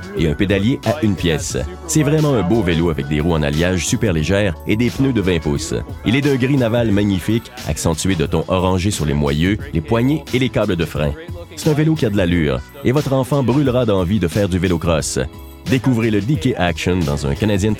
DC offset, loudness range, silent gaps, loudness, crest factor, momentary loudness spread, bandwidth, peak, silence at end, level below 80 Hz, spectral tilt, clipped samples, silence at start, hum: under 0.1%; 1 LU; none; -17 LUFS; 16 dB; 5 LU; 16.5 kHz; 0 dBFS; 0 s; -32 dBFS; -6 dB/octave; under 0.1%; 0 s; none